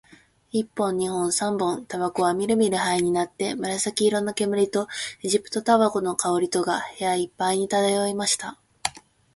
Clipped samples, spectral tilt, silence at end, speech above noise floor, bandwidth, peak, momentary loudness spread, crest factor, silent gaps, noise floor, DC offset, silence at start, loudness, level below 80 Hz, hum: under 0.1%; -3.5 dB/octave; 0.35 s; 30 dB; 12 kHz; -4 dBFS; 7 LU; 20 dB; none; -54 dBFS; under 0.1%; 0.55 s; -24 LUFS; -64 dBFS; none